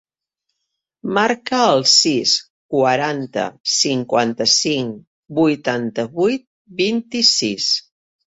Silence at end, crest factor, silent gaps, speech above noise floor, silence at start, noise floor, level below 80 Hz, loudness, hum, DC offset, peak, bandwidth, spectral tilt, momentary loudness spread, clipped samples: 0.45 s; 18 dB; 2.50-2.69 s, 3.60-3.64 s, 5.07-5.23 s, 6.47-6.65 s; 60 dB; 1.05 s; -78 dBFS; -62 dBFS; -17 LUFS; none; under 0.1%; -2 dBFS; 8 kHz; -2.5 dB/octave; 11 LU; under 0.1%